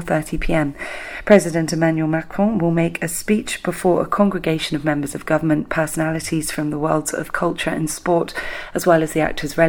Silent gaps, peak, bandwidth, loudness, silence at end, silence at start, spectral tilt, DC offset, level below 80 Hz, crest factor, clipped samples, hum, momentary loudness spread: none; 0 dBFS; 19 kHz; -20 LUFS; 0 s; 0 s; -5.5 dB/octave; under 0.1%; -38 dBFS; 20 dB; under 0.1%; none; 7 LU